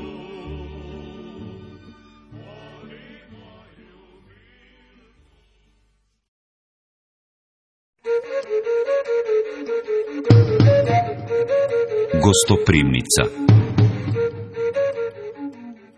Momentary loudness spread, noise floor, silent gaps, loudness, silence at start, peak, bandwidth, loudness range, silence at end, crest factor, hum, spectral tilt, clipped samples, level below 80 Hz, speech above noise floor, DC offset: 22 LU; -65 dBFS; 6.28-7.93 s; -19 LUFS; 0 s; 0 dBFS; 11 kHz; 21 LU; 0.25 s; 22 dB; none; -5.5 dB/octave; under 0.1%; -42 dBFS; 48 dB; under 0.1%